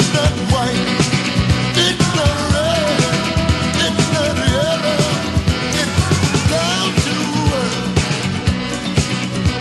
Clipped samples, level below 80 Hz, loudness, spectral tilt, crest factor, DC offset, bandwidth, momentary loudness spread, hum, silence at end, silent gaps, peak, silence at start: under 0.1%; -30 dBFS; -16 LUFS; -4.5 dB/octave; 14 dB; under 0.1%; 12.5 kHz; 3 LU; none; 0 s; none; -2 dBFS; 0 s